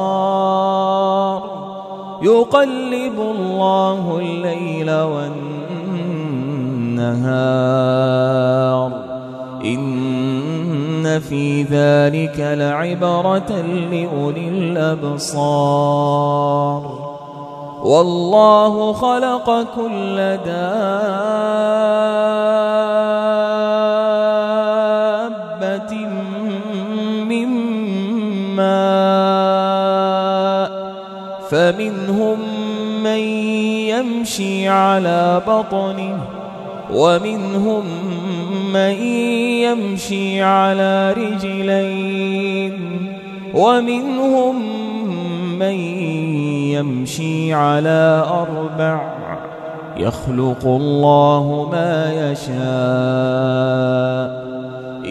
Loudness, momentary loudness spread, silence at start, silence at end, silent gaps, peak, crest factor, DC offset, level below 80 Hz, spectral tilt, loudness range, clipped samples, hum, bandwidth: -17 LUFS; 10 LU; 0 s; 0 s; none; 0 dBFS; 16 dB; under 0.1%; -54 dBFS; -6.5 dB/octave; 4 LU; under 0.1%; none; 13.5 kHz